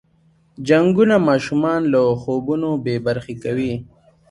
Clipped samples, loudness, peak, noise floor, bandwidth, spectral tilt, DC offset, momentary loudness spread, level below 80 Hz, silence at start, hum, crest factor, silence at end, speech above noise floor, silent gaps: under 0.1%; -18 LUFS; -2 dBFS; -57 dBFS; 11 kHz; -7.5 dB/octave; under 0.1%; 11 LU; -52 dBFS; 0.6 s; none; 16 dB; 0.45 s; 40 dB; none